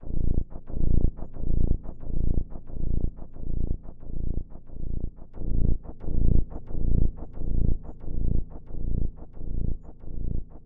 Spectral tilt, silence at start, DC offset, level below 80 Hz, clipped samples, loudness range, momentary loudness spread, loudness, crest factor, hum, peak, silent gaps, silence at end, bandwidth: -14 dB/octave; 0 s; under 0.1%; -26 dBFS; under 0.1%; 4 LU; 12 LU; -33 LUFS; 14 dB; none; -8 dBFS; none; 0.05 s; 1.1 kHz